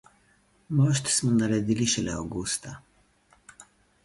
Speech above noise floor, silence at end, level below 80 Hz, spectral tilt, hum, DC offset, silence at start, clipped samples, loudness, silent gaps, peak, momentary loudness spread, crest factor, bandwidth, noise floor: 38 dB; 0.4 s; -54 dBFS; -4.5 dB/octave; 50 Hz at -55 dBFS; under 0.1%; 0.7 s; under 0.1%; -26 LUFS; none; -12 dBFS; 9 LU; 16 dB; 11.5 kHz; -64 dBFS